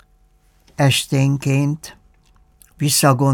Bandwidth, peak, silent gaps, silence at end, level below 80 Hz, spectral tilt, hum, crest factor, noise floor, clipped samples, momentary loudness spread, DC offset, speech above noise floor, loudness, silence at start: 18.5 kHz; -2 dBFS; none; 0 s; -54 dBFS; -4.5 dB/octave; 50 Hz at -45 dBFS; 16 dB; -55 dBFS; under 0.1%; 16 LU; under 0.1%; 39 dB; -17 LUFS; 0.8 s